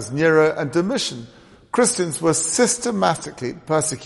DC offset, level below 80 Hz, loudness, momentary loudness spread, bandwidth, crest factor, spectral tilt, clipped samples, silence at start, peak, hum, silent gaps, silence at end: under 0.1%; -56 dBFS; -19 LUFS; 10 LU; 11.5 kHz; 18 dB; -3.5 dB/octave; under 0.1%; 0 s; -2 dBFS; none; none; 0 s